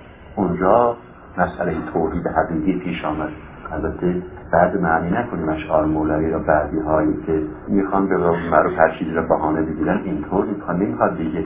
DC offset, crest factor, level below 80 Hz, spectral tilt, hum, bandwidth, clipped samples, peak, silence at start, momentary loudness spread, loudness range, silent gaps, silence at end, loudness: under 0.1%; 18 dB; -38 dBFS; -11.5 dB/octave; none; 3.9 kHz; under 0.1%; 0 dBFS; 0 s; 7 LU; 3 LU; none; 0 s; -20 LUFS